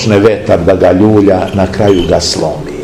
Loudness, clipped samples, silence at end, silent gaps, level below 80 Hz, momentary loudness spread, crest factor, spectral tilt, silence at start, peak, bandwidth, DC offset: -9 LUFS; 4%; 0 s; none; -30 dBFS; 6 LU; 8 dB; -6 dB/octave; 0 s; 0 dBFS; 15.5 kHz; 0.5%